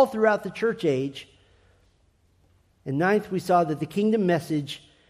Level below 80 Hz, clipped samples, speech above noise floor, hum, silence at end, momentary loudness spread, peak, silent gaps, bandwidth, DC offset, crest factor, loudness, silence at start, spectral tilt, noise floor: -64 dBFS; under 0.1%; 39 dB; none; 0.35 s; 11 LU; -8 dBFS; none; 15 kHz; under 0.1%; 18 dB; -25 LUFS; 0 s; -6.5 dB/octave; -64 dBFS